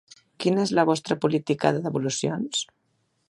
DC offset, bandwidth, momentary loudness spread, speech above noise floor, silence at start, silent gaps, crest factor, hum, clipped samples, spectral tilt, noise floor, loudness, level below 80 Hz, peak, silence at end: under 0.1%; 11.5 kHz; 7 LU; 47 dB; 0.4 s; none; 22 dB; none; under 0.1%; -5 dB/octave; -71 dBFS; -25 LUFS; -66 dBFS; -4 dBFS; 0.65 s